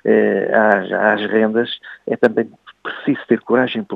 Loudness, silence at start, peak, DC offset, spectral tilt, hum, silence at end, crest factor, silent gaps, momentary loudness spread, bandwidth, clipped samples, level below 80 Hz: -17 LUFS; 0.05 s; 0 dBFS; under 0.1%; -7.5 dB/octave; none; 0 s; 16 dB; none; 12 LU; 5.2 kHz; under 0.1%; -68 dBFS